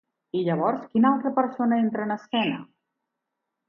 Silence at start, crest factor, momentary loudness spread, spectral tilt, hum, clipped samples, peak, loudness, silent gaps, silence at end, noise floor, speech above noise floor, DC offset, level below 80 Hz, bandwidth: 0.35 s; 18 dB; 8 LU; -8.5 dB/octave; none; under 0.1%; -8 dBFS; -25 LUFS; none; 1.05 s; -83 dBFS; 59 dB; under 0.1%; -74 dBFS; 5.8 kHz